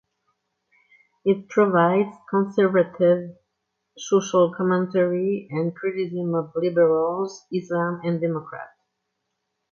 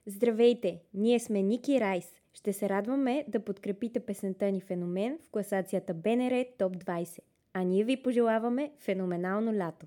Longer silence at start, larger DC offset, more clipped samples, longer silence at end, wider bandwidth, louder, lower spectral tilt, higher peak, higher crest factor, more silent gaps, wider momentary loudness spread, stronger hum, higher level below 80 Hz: first, 1.25 s vs 0.05 s; neither; neither; first, 1.05 s vs 0 s; second, 7.2 kHz vs 17 kHz; first, -22 LUFS vs -31 LUFS; about the same, -7 dB/octave vs -6.5 dB/octave; first, -6 dBFS vs -14 dBFS; about the same, 16 dB vs 16 dB; neither; about the same, 10 LU vs 9 LU; neither; first, -70 dBFS vs -78 dBFS